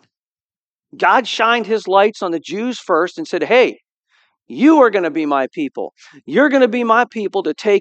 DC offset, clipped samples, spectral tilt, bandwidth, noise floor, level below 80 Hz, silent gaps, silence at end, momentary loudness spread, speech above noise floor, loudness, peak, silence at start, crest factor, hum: under 0.1%; under 0.1%; -4.5 dB/octave; 8.6 kHz; under -90 dBFS; -72 dBFS; 3.92-4.03 s; 0 s; 11 LU; over 75 dB; -15 LUFS; 0 dBFS; 0.95 s; 16 dB; none